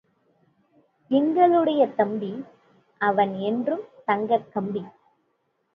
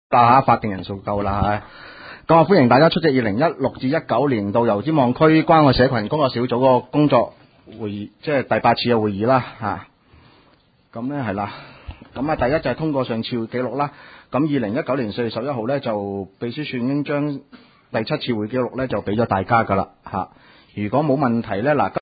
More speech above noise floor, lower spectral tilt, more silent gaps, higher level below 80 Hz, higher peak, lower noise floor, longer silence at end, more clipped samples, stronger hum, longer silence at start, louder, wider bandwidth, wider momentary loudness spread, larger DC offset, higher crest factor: first, 49 dB vs 38 dB; second, -9 dB/octave vs -12 dB/octave; neither; second, -74 dBFS vs -46 dBFS; second, -6 dBFS vs 0 dBFS; first, -72 dBFS vs -57 dBFS; first, 0.85 s vs 0 s; neither; neither; first, 1.1 s vs 0.1 s; second, -24 LUFS vs -19 LUFS; about the same, 5.2 kHz vs 5 kHz; about the same, 15 LU vs 15 LU; neither; about the same, 18 dB vs 18 dB